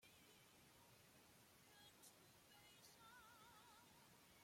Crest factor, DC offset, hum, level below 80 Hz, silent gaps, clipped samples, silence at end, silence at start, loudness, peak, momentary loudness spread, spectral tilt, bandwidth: 16 dB; under 0.1%; none; -90 dBFS; none; under 0.1%; 0 s; 0 s; -68 LUFS; -54 dBFS; 4 LU; -2.5 dB/octave; 16.5 kHz